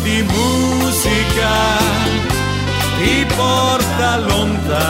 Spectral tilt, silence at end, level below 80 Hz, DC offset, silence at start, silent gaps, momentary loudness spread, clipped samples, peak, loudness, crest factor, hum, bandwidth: -4 dB/octave; 0 s; -28 dBFS; under 0.1%; 0 s; none; 3 LU; under 0.1%; -2 dBFS; -15 LUFS; 14 dB; none; 16.5 kHz